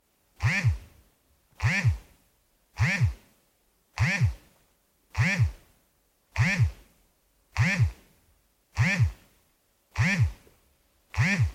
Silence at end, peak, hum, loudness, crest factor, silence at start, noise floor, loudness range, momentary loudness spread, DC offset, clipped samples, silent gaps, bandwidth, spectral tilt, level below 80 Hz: 0 s; -12 dBFS; none; -27 LUFS; 16 dB; 0.4 s; -69 dBFS; 2 LU; 14 LU; under 0.1%; under 0.1%; none; 14 kHz; -5.5 dB/octave; -44 dBFS